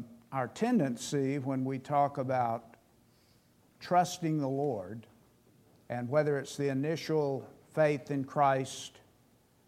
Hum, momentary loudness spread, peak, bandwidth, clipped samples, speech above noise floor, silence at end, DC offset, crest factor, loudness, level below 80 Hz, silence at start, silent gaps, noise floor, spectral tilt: none; 11 LU; -14 dBFS; 15.5 kHz; under 0.1%; 35 dB; 0.8 s; under 0.1%; 18 dB; -32 LUFS; -76 dBFS; 0 s; none; -66 dBFS; -6 dB/octave